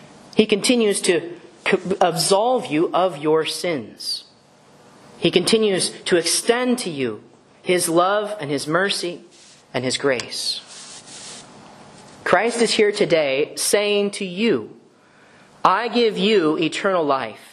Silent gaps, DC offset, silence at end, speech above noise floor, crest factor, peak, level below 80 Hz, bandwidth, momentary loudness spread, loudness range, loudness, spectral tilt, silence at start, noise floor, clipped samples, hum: none; under 0.1%; 0.15 s; 32 dB; 20 dB; 0 dBFS; -66 dBFS; 13 kHz; 12 LU; 4 LU; -20 LUFS; -3.5 dB/octave; 0 s; -52 dBFS; under 0.1%; none